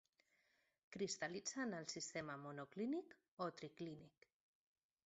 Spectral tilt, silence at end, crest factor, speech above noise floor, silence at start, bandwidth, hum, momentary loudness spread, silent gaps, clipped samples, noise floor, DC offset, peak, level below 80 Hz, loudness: -3.5 dB/octave; 1 s; 18 dB; 34 dB; 0.9 s; 8 kHz; none; 12 LU; 3.28-3.37 s; under 0.1%; -82 dBFS; under 0.1%; -32 dBFS; -86 dBFS; -48 LUFS